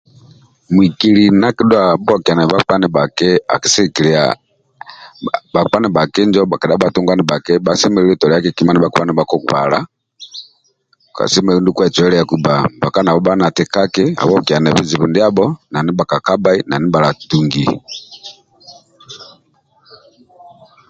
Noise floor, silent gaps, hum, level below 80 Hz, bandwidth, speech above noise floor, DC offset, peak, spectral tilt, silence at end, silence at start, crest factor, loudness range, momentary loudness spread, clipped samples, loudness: -58 dBFS; none; none; -48 dBFS; 9.2 kHz; 45 dB; under 0.1%; 0 dBFS; -5 dB/octave; 1.65 s; 0.7 s; 14 dB; 4 LU; 13 LU; under 0.1%; -13 LUFS